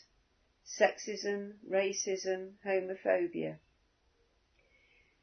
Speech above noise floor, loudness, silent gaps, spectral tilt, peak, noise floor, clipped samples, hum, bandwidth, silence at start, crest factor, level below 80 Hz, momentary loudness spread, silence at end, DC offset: 39 dB; -34 LUFS; none; -3 dB/octave; -12 dBFS; -73 dBFS; under 0.1%; none; 6.4 kHz; 0.65 s; 24 dB; -78 dBFS; 10 LU; 1.65 s; under 0.1%